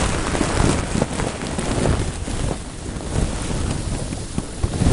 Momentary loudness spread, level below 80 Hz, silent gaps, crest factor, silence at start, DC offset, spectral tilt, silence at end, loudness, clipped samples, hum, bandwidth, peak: 8 LU; -26 dBFS; none; 18 dB; 0 s; under 0.1%; -5 dB/octave; 0 s; -23 LUFS; under 0.1%; none; 11.5 kHz; -4 dBFS